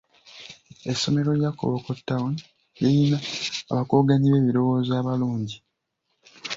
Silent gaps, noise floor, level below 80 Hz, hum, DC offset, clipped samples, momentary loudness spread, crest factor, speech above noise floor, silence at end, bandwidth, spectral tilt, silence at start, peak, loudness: none; -76 dBFS; -58 dBFS; none; under 0.1%; under 0.1%; 18 LU; 18 dB; 54 dB; 0 s; 7.8 kHz; -6.5 dB/octave; 0.35 s; -6 dBFS; -23 LUFS